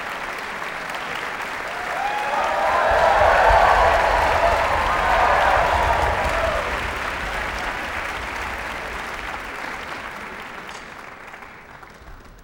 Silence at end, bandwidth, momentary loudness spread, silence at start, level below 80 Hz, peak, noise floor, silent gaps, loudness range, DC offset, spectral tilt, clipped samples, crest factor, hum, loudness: 0 s; 19 kHz; 18 LU; 0 s; -34 dBFS; -2 dBFS; -42 dBFS; none; 14 LU; under 0.1%; -4 dB/octave; under 0.1%; 18 dB; none; -20 LUFS